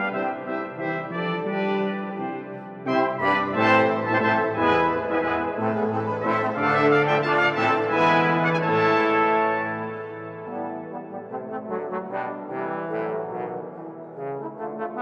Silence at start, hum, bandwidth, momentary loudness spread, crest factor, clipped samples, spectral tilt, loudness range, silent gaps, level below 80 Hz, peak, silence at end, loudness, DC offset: 0 s; none; 8 kHz; 15 LU; 20 dB; under 0.1%; -7 dB/octave; 10 LU; none; -62 dBFS; -4 dBFS; 0 s; -23 LUFS; under 0.1%